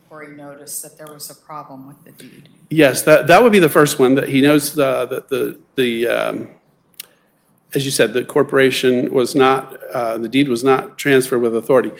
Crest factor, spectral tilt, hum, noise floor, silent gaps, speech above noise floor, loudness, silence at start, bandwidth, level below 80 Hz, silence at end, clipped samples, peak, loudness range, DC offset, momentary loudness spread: 16 dB; -4.5 dB/octave; none; -59 dBFS; none; 43 dB; -15 LUFS; 0.1 s; 17 kHz; -56 dBFS; 0.05 s; under 0.1%; 0 dBFS; 7 LU; under 0.1%; 22 LU